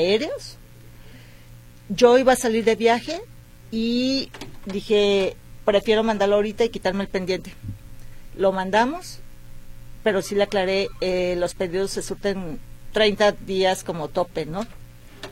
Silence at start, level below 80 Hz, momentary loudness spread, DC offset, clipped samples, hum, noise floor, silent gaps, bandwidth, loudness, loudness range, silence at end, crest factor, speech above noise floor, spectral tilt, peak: 0 s; -44 dBFS; 16 LU; under 0.1%; under 0.1%; none; -45 dBFS; none; 16.5 kHz; -22 LUFS; 4 LU; 0 s; 20 dB; 23 dB; -4.5 dB/octave; -2 dBFS